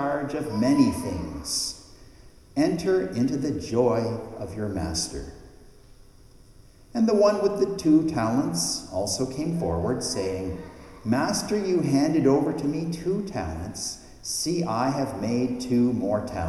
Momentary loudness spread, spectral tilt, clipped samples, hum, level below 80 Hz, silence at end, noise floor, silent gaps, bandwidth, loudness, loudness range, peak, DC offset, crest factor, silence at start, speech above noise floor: 12 LU; -5 dB/octave; under 0.1%; none; -48 dBFS; 0 s; -51 dBFS; none; 13.5 kHz; -25 LUFS; 4 LU; -8 dBFS; under 0.1%; 18 dB; 0 s; 26 dB